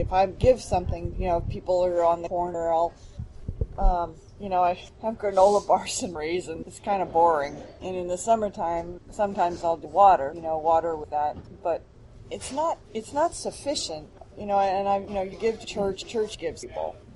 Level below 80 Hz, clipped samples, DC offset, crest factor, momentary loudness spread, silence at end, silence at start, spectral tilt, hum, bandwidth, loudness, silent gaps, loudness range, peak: -38 dBFS; under 0.1%; under 0.1%; 20 dB; 13 LU; 0 s; 0 s; -5 dB/octave; none; 11.5 kHz; -26 LUFS; none; 4 LU; -6 dBFS